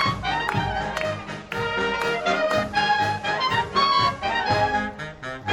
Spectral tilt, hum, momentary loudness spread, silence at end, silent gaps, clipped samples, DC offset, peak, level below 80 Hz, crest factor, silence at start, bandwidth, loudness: -4.5 dB/octave; none; 10 LU; 0 s; none; under 0.1%; under 0.1%; -6 dBFS; -46 dBFS; 16 dB; 0 s; 17 kHz; -23 LUFS